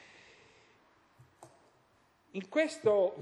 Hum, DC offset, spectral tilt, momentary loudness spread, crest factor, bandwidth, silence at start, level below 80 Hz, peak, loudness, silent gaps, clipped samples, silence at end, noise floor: none; under 0.1%; -5 dB/octave; 18 LU; 20 dB; 11.5 kHz; 1.4 s; -82 dBFS; -16 dBFS; -32 LUFS; none; under 0.1%; 0 s; -69 dBFS